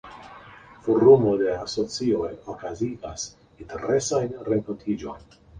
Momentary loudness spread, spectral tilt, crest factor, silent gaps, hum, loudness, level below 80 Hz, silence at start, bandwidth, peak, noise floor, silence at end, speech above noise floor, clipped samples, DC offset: 22 LU; -5.5 dB/octave; 20 dB; none; none; -24 LUFS; -52 dBFS; 0.05 s; 10 kHz; -4 dBFS; -47 dBFS; 0 s; 24 dB; under 0.1%; under 0.1%